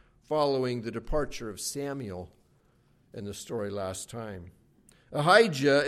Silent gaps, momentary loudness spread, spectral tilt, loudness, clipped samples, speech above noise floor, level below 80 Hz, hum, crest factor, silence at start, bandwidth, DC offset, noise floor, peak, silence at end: none; 21 LU; -4.5 dB/octave; -29 LUFS; under 0.1%; 37 dB; -48 dBFS; none; 24 dB; 0.3 s; 14.5 kHz; under 0.1%; -65 dBFS; -6 dBFS; 0 s